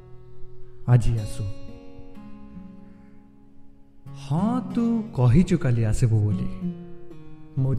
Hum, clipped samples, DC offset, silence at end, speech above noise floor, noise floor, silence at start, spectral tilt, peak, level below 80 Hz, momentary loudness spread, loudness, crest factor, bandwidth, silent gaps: none; under 0.1%; under 0.1%; 0 s; 26 dB; -47 dBFS; 0.05 s; -8 dB/octave; -6 dBFS; -36 dBFS; 25 LU; -24 LUFS; 18 dB; 10.5 kHz; none